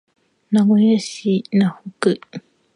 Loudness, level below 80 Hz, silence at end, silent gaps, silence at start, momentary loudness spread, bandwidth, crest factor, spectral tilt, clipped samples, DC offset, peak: -18 LUFS; -68 dBFS; 0.35 s; none; 0.5 s; 12 LU; 11 kHz; 16 dB; -6.5 dB/octave; under 0.1%; under 0.1%; -4 dBFS